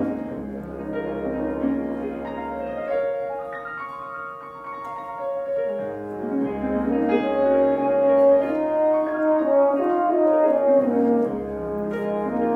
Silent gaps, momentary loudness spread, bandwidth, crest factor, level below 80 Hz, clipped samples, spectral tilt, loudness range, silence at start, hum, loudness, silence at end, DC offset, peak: none; 14 LU; 4.5 kHz; 16 dB; -52 dBFS; under 0.1%; -8.5 dB/octave; 10 LU; 0 s; none; -23 LUFS; 0 s; under 0.1%; -8 dBFS